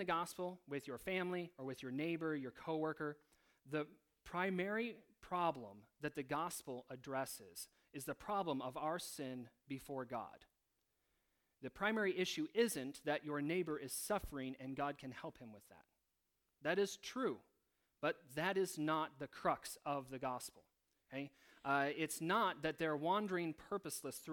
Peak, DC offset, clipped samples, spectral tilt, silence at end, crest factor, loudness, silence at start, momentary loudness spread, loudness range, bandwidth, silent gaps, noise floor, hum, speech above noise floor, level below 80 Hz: -22 dBFS; under 0.1%; under 0.1%; -4.5 dB/octave; 0 s; 20 dB; -43 LUFS; 0 s; 13 LU; 5 LU; 19 kHz; none; -86 dBFS; none; 44 dB; -72 dBFS